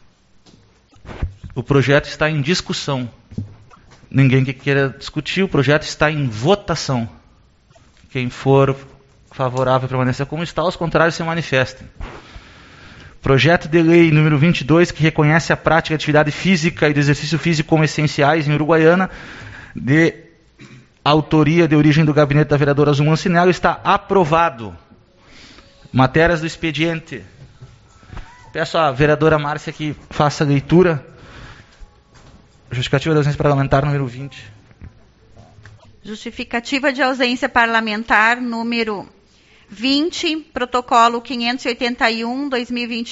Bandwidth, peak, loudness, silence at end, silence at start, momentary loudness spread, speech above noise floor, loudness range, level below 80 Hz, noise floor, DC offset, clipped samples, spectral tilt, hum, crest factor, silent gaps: 8 kHz; 0 dBFS; -16 LUFS; 0 s; 1.05 s; 14 LU; 35 dB; 6 LU; -42 dBFS; -51 dBFS; under 0.1%; under 0.1%; -5 dB/octave; none; 18 dB; none